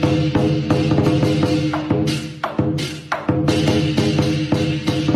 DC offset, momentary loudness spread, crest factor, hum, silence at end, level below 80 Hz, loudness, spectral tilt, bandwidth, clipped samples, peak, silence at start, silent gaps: under 0.1%; 6 LU; 12 dB; none; 0 s; -42 dBFS; -19 LUFS; -6.5 dB/octave; 13.5 kHz; under 0.1%; -6 dBFS; 0 s; none